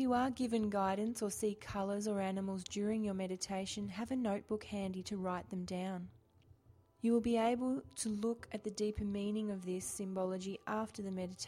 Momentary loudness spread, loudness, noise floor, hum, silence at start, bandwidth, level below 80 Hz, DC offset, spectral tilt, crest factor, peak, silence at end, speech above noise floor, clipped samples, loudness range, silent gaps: 8 LU; -39 LUFS; -67 dBFS; none; 0 s; 15.5 kHz; -64 dBFS; under 0.1%; -5 dB/octave; 16 dB; -24 dBFS; 0 s; 29 dB; under 0.1%; 3 LU; none